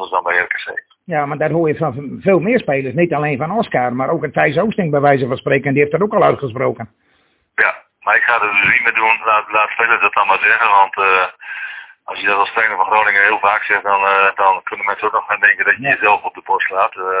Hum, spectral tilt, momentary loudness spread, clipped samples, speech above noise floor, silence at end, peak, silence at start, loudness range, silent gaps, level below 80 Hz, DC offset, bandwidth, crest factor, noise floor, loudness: none; -9 dB/octave; 9 LU; under 0.1%; 43 dB; 0 s; 0 dBFS; 0 s; 4 LU; none; -56 dBFS; under 0.1%; 4 kHz; 16 dB; -58 dBFS; -14 LUFS